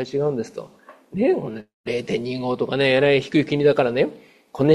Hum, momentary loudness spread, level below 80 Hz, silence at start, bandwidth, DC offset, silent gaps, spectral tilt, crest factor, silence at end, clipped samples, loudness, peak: none; 16 LU; -58 dBFS; 0 s; 11.5 kHz; under 0.1%; 1.74-1.84 s; -7 dB/octave; 18 dB; 0 s; under 0.1%; -21 LUFS; -2 dBFS